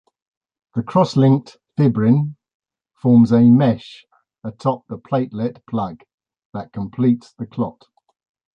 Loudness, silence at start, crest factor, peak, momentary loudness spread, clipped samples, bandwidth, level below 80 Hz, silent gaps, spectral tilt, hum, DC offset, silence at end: -18 LUFS; 0.75 s; 16 dB; -2 dBFS; 18 LU; under 0.1%; 7.2 kHz; -56 dBFS; 2.54-2.60 s, 6.14-6.18 s, 6.45-6.53 s; -9 dB/octave; none; under 0.1%; 0.85 s